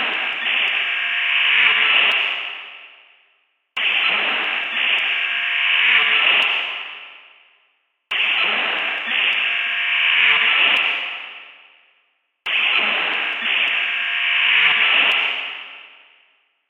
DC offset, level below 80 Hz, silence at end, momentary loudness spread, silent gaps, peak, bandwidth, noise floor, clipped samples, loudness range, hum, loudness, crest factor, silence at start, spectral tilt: under 0.1%; -80 dBFS; 0.8 s; 14 LU; none; -2 dBFS; 9.8 kHz; -65 dBFS; under 0.1%; 4 LU; none; -16 LUFS; 18 dB; 0 s; -1 dB/octave